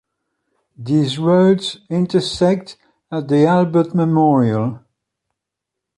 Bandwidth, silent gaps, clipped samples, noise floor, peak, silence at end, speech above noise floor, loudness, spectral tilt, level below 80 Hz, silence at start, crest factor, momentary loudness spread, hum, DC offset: 11.5 kHz; none; under 0.1%; -82 dBFS; -2 dBFS; 1.2 s; 66 dB; -16 LUFS; -7 dB/octave; -54 dBFS; 0.8 s; 14 dB; 10 LU; none; under 0.1%